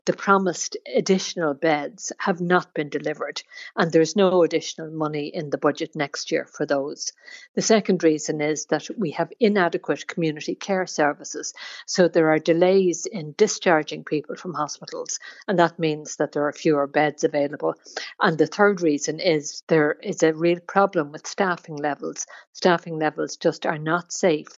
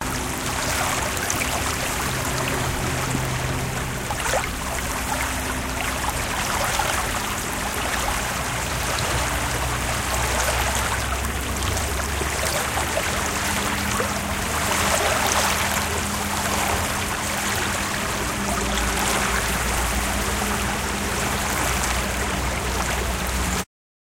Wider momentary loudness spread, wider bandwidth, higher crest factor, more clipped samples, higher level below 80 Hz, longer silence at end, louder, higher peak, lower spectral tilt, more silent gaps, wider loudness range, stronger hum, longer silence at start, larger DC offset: first, 12 LU vs 4 LU; second, 7.8 kHz vs 17 kHz; about the same, 20 dB vs 20 dB; neither; second, -78 dBFS vs -32 dBFS; second, 0.15 s vs 0.35 s; about the same, -23 LUFS vs -23 LUFS; about the same, -4 dBFS vs -4 dBFS; first, -4.5 dB/octave vs -3 dB/octave; first, 7.49-7.54 s, 19.63-19.67 s, 22.47-22.53 s vs none; about the same, 3 LU vs 3 LU; neither; about the same, 0.05 s vs 0 s; neither